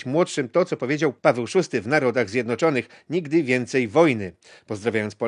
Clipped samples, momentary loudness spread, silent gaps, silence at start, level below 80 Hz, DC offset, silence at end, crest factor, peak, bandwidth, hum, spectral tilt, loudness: under 0.1%; 9 LU; none; 0 s; -62 dBFS; under 0.1%; 0 s; 20 dB; -2 dBFS; 10.5 kHz; none; -6 dB/octave; -22 LUFS